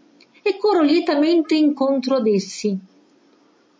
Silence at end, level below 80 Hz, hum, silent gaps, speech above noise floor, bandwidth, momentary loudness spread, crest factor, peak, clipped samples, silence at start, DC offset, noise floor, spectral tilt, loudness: 1 s; -72 dBFS; none; none; 38 dB; 8 kHz; 9 LU; 12 dB; -6 dBFS; under 0.1%; 0.45 s; under 0.1%; -56 dBFS; -5.5 dB/octave; -19 LUFS